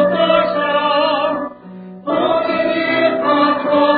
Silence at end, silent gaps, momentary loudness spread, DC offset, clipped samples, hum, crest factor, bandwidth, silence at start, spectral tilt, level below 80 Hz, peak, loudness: 0 s; none; 12 LU; under 0.1%; under 0.1%; none; 14 dB; 4.9 kHz; 0 s; -10 dB/octave; -56 dBFS; -2 dBFS; -15 LUFS